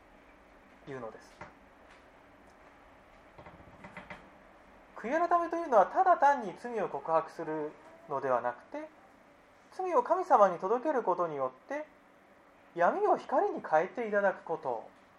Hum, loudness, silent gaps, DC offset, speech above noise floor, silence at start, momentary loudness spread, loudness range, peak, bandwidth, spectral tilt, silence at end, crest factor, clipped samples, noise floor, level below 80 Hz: none; -30 LUFS; none; under 0.1%; 30 dB; 0.85 s; 24 LU; 19 LU; -10 dBFS; 11 kHz; -6 dB/octave; 0.3 s; 22 dB; under 0.1%; -60 dBFS; -72 dBFS